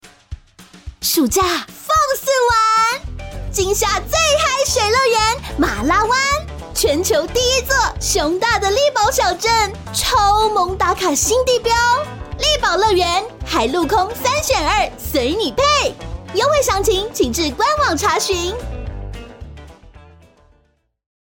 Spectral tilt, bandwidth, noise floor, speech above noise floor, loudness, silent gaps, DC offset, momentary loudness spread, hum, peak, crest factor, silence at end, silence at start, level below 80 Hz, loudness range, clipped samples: -2.5 dB/octave; 17 kHz; -60 dBFS; 44 dB; -16 LUFS; none; under 0.1%; 9 LU; none; -4 dBFS; 12 dB; 1.25 s; 0.05 s; -32 dBFS; 2 LU; under 0.1%